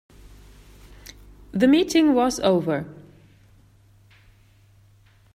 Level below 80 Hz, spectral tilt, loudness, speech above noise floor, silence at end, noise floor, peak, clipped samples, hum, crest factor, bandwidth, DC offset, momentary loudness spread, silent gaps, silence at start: -52 dBFS; -5 dB/octave; -20 LUFS; 36 dB; 2.35 s; -55 dBFS; -6 dBFS; under 0.1%; none; 20 dB; 15 kHz; under 0.1%; 27 LU; none; 1.55 s